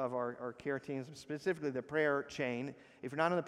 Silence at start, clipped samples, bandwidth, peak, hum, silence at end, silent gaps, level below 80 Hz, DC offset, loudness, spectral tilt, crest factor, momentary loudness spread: 0 s; under 0.1%; 13 kHz; -18 dBFS; none; 0 s; none; -76 dBFS; under 0.1%; -38 LUFS; -6 dB/octave; 20 dB; 10 LU